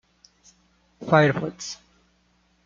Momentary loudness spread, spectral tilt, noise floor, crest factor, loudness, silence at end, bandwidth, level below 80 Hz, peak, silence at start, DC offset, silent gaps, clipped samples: 21 LU; -6 dB/octave; -65 dBFS; 24 dB; -22 LUFS; 0.9 s; 7.6 kHz; -62 dBFS; -2 dBFS; 1 s; under 0.1%; none; under 0.1%